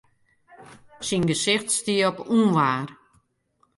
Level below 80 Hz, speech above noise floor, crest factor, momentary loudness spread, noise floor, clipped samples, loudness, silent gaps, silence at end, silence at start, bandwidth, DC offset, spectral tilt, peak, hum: -62 dBFS; 45 dB; 18 dB; 9 LU; -68 dBFS; under 0.1%; -22 LUFS; none; 0.85 s; 0.6 s; 11.5 kHz; under 0.1%; -4 dB/octave; -8 dBFS; none